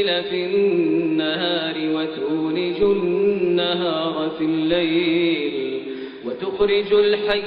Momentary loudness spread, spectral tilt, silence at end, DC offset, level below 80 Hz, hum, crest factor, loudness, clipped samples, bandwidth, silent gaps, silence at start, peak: 8 LU; -3.5 dB/octave; 0 s; under 0.1%; -54 dBFS; none; 14 dB; -20 LUFS; under 0.1%; 5.2 kHz; none; 0 s; -6 dBFS